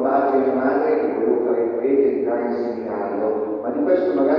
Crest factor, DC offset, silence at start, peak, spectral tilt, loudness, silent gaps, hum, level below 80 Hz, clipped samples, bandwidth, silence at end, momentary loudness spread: 14 dB; under 0.1%; 0 s; -4 dBFS; -9.5 dB/octave; -20 LUFS; none; none; -64 dBFS; under 0.1%; 5.4 kHz; 0 s; 6 LU